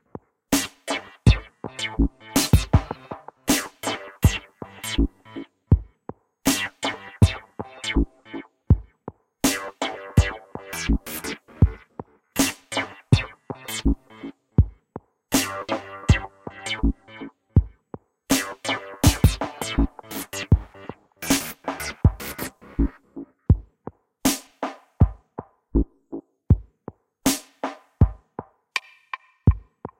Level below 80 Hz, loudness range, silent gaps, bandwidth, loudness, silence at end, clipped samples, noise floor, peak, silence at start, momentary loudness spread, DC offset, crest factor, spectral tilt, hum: -30 dBFS; 3 LU; none; 16.5 kHz; -25 LUFS; 0.15 s; under 0.1%; -44 dBFS; -2 dBFS; 0.5 s; 19 LU; under 0.1%; 22 dB; -5 dB/octave; none